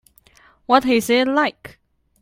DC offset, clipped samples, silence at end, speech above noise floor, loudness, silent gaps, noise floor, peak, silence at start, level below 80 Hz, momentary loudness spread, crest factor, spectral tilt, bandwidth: under 0.1%; under 0.1%; 0.55 s; 35 dB; -18 LUFS; none; -53 dBFS; 0 dBFS; 0.7 s; -56 dBFS; 7 LU; 20 dB; -3.5 dB/octave; 16.5 kHz